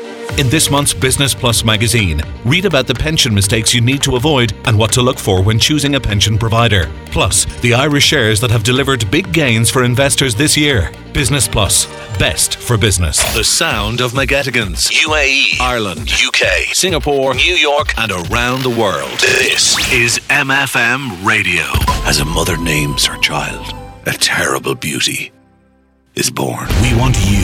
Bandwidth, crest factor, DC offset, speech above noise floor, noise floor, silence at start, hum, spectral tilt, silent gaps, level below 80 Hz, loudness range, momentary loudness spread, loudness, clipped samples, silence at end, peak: 20 kHz; 14 dB; under 0.1%; 39 dB; -52 dBFS; 0 s; none; -3.5 dB/octave; none; -28 dBFS; 3 LU; 6 LU; -12 LUFS; under 0.1%; 0 s; 0 dBFS